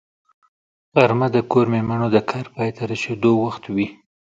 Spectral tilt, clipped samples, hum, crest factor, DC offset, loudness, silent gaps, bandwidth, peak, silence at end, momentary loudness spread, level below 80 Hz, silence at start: -7.5 dB/octave; under 0.1%; none; 20 dB; under 0.1%; -20 LUFS; none; 7.8 kHz; 0 dBFS; 0.4 s; 9 LU; -56 dBFS; 0.95 s